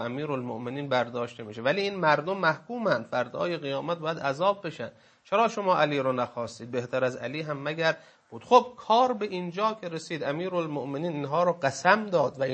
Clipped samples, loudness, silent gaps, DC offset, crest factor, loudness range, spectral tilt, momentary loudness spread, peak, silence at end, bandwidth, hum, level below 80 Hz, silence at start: under 0.1%; -28 LUFS; none; under 0.1%; 22 dB; 2 LU; -5.5 dB/octave; 11 LU; -4 dBFS; 0 s; 8.6 kHz; none; -74 dBFS; 0 s